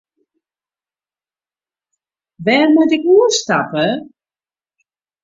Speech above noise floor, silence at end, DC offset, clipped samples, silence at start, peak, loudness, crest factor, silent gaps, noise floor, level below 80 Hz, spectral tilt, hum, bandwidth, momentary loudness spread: over 77 dB; 1.2 s; under 0.1%; under 0.1%; 2.4 s; -2 dBFS; -14 LUFS; 16 dB; none; under -90 dBFS; -64 dBFS; -4 dB/octave; none; 7.8 kHz; 8 LU